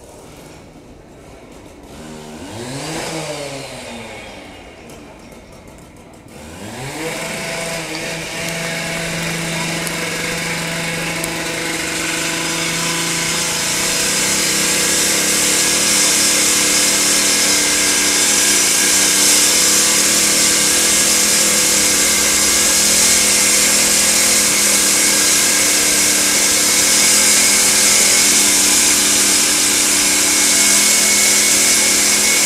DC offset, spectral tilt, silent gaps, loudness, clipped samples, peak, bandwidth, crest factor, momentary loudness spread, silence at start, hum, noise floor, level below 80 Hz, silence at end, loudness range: under 0.1%; 0 dB/octave; none; -11 LUFS; under 0.1%; 0 dBFS; 16 kHz; 16 dB; 14 LU; 0 s; none; -39 dBFS; -44 dBFS; 0 s; 18 LU